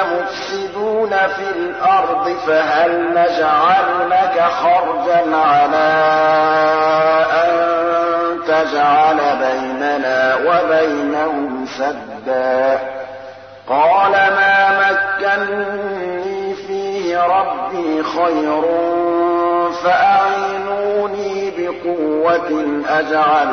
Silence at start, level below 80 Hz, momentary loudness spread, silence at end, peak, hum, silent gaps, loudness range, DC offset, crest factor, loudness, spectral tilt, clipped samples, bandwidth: 0 s; -60 dBFS; 10 LU; 0 s; -4 dBFS; none; none; 4 LU; 0.1%; 12 dB; -15 LUFS; -5 dB/octave; under 0.1%; 6.6 kHz